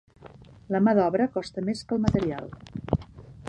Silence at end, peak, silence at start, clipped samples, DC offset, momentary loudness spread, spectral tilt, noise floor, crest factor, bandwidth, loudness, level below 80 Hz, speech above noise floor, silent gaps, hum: 0 s; -6 dBFS; 0.25 s; under 0.1%; under 0.1%; 17 LU; -7.5 dB/octave; -49 dBFS; 20 dB; 10.5 kHz; -26 LUFS; -46 dBFS; 24 dB; none; none